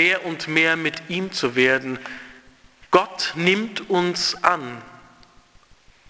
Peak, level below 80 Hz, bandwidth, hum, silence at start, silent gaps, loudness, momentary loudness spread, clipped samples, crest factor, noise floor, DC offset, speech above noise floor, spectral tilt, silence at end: 0 dBFS; -60 dBFS; 8 kHz; none; 0 s; none; -21 LUFS; 14 LU; under 0.1%; 22 dB; -53 dBFS; under 0.1%; 31 dB; -4 dB/octave; 1.15 s